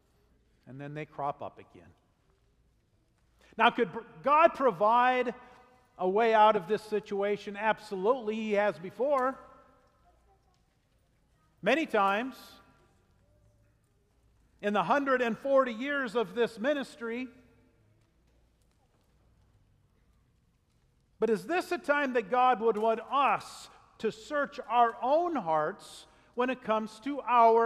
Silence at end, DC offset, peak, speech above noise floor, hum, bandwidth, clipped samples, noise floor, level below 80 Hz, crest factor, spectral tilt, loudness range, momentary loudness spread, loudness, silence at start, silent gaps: 0 s; under 0.1%; -8 dBFS; 41 dB; none; 13.5 kHz; under 0.1%; -70 dBFS; -70 dBFS; 22 dB; -5 dB/octave; 9 LU; 16 LU; -29 LUFS; 0.65 s; none